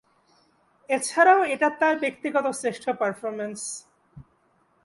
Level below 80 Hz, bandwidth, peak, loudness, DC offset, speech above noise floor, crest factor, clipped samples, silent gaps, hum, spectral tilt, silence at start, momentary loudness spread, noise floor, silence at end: -68 dBFS; 11.5 kHz; -6 dBFS; -24 LUFS; under 0.1%; 42 dB; 20 dB; under 0.1%; none; none; -3 dB/octave; 0.9 s; 14 LU; -65 dBFS; 0.6 s